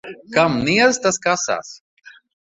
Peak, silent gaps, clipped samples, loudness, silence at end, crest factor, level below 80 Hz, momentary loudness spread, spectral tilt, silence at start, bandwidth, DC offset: -2 dBFS; 1.80-1.97 s; under 0.1%; -18 LUFS; 0.35 s; 18 dB; -54 dBFS; 10 LU; -3.5 dB/octave; 0.05 s; 8.2 kHz; under 0.1%